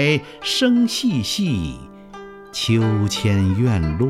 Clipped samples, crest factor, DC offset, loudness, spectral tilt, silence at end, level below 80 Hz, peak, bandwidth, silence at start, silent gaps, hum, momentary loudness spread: under 0.1%; 16 dB; under 0.1%; -19 LUFS; -5.5 dB/octave; 0 s; -40 dBFS; -4 dBFS; 15 kHz; 0 s; none; none; 21 LU